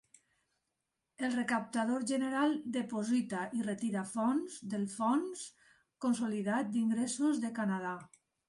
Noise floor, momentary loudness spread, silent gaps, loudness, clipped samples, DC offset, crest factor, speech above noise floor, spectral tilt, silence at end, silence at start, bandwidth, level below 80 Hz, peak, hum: -87 dBFS; 6 LU; none; -35 LUFS; under 0.1%; under 0.1%; 14 dB; 53 dB; -5 dB/octave; 0.4 s; 1.2 s; 11.5 kHz; -78 dBFS; -20 dBFS; none